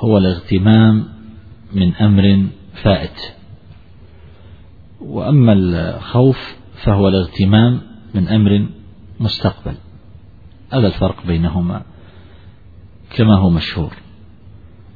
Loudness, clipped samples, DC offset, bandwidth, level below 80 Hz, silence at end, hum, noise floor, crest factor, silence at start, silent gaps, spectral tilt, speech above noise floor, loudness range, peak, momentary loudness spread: -15 LUFS; under 0.1%; 0.6%; 4.9 kHz; -36 dBFS; 1 s; none; -42 dBFS; 16 dB; 0 s; none; -10 dB/octave; 28 dB; 6 LU; 0 dBFS; 16 LU